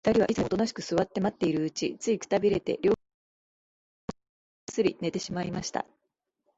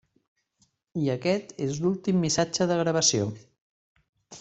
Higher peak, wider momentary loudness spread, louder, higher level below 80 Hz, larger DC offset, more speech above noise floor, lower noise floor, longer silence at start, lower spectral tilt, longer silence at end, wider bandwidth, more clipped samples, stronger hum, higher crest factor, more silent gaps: about the same, -12 dBFS vs -10 dBFS; first, 16 LU vs 10 LU; second, -29 LUFS vs -26 LUFS; about the same, -58 dBFS vs -62 dBFS; neither; first, 49 dB vs 44 dB; first, -76 dBFS vs -70 dBFS; second, 0.05 s vs 0.95 s; first, -5.5 dB/octave vs -4 dB/octave; first, 0.75 s vs 0 s; about the same, 8 kHz vs 8.4 kHz; neither; neither; about the same, 18 dB vs 18 dB; first, 3.14-4.08 s, 4.29-4.67 s vs 3.61-3.96 s, 4.09-4.13 s